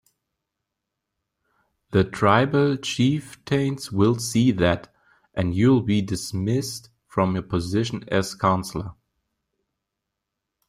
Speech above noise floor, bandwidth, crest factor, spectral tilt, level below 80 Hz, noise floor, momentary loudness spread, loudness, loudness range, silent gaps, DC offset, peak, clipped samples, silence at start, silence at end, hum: 61 dB; 16 kHz; 20 dB; -6 dB/octave; -52 dBFS; -83 dBFS; 10 LU; -23 LUFS; 5 LU; none; under 0.1%; -4 dBFS; under 0.1%; 1.9 s; 1.75 s; none